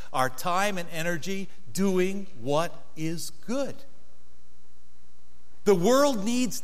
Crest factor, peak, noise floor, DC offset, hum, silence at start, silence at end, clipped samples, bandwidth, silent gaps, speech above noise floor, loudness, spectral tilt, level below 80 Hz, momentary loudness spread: 20 dB; -8 dBFS; -61 dBFS; 4%; none; 0 s; 0.05 s; under 0.1%; 16 kHz; none; 34 dB; -28 LUFS; -4.5 dB/octave; -64 dBFS; 14 LU